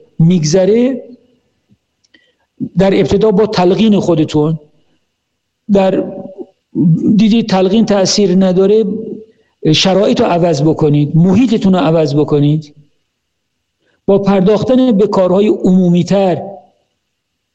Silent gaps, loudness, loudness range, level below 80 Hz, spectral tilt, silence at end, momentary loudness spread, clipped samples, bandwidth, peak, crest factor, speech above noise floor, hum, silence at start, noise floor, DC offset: none; -11 LUFS; 3 LU; -44 dBFS; -6.5 dB/octave; 0.95 s; 10 LU; under 0.1%; 8.2 kHz; -2 dBFS; 10 dB; 60 dB; none; 0.2 s; -69 dBFS; under 0.1%